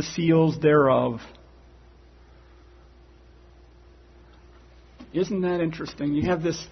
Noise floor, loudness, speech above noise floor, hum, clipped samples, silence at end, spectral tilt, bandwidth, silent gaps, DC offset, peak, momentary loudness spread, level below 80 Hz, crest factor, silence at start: -51 dBFS; -23 LUFS; 29 dB; none; under 0.1%; 0 s; -6.5 dB/octave; 6.4 kHz; none; under 0.1%; -8 dBFS; 12 LU; -52 dBFS; 18 dB; 0 s